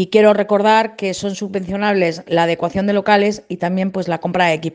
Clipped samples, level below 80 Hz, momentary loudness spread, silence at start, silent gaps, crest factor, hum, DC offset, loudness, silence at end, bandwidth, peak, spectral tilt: under 0.1%; -52 dBFS; 9 LU; 0 s; none; 16 dB; none; under 0.1%; -17 LUFS; 0 s; 9.6 kHz; 0 dBFS; -5.5 dB/octave